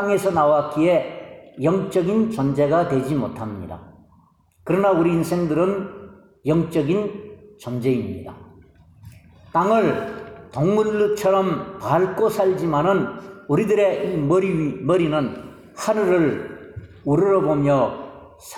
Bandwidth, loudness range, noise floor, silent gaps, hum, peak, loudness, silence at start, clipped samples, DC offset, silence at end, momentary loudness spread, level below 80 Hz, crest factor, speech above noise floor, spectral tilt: 14.5 kHz; 4 LU; -56 dBFS; none; none; -4 dBFS; -20 LUFS; 0 s; under 0.1%; under 0.1%; 0 s; 18 LU; -54 dBFS; 16 dB; 37 dB; -7.5 dB/octave